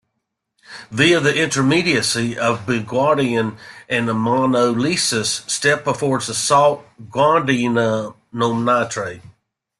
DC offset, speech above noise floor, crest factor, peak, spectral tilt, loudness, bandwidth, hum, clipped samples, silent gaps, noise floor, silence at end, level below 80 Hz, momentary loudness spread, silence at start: under 0.1%; 58 dB; 16 dB; -2 dBFS; -4 dB/octave; -18 LUFS; 12.5 kHz; none; under 0.1%; none; -76 dBFS; 0.5 s; -56 dBFS; 10 LU; 0.7 s